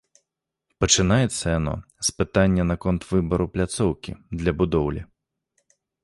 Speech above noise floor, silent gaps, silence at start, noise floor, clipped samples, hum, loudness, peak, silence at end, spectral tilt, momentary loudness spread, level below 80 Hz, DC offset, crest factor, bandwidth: 59 dB; none; 0.8 s; -81 dBFS; under 0.1%; none; -23 LUFS; -2 dBFS; 1 s; -4.5 dB/octave; 9 LU; -38 dBFS; under 0.1%; 22 dB; 11.5 kHz